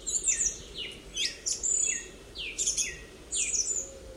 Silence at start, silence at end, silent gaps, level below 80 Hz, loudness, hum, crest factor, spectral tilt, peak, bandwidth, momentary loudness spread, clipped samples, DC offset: 0 s; 0 s; none; -52 dBFS; -29 LUFS; none; 18 dB; 1 dB/octave; -14 dBFS; 16 kHz; 13 LU; under 0.1%; under 0.1%